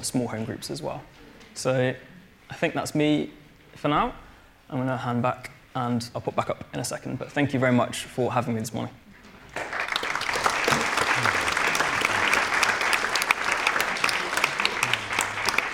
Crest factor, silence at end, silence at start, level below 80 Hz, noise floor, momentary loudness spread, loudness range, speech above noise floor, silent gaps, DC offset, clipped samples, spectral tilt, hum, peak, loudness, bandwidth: 24 dB; 0 s; 0 s; -54 dBFS; -48 dBFS; 11 LU; 6 LU; 21 dB; none; under 0.1%; under 0.1%; -3.5 dB/octave; none; -2 dBFS; -25 LUFS; 18 kHz